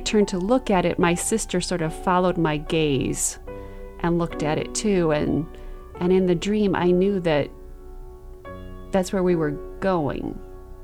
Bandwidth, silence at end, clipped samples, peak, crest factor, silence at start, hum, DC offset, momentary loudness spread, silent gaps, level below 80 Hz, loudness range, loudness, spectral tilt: 15 kHz; 0 s; under 0.1%; -6 dBFS; 16 dB; 0 s; none; under 0.1%; 18 LU; none; -38 dBFS; 3 LU; -23 LUFS; -5 dB/octave